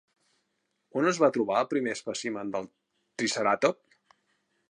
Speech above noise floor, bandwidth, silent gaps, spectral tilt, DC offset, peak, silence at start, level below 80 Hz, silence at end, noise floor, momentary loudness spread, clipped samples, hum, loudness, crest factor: 50 dB; 11 kHz; none; -4 dB/octave; under 0.1%; -8 dBFS; 0.95 s; -78 dBFS; 0.95 s; -78 dBFS; 13 LU; under 0.1%; none; -28 LUFS; 22 dB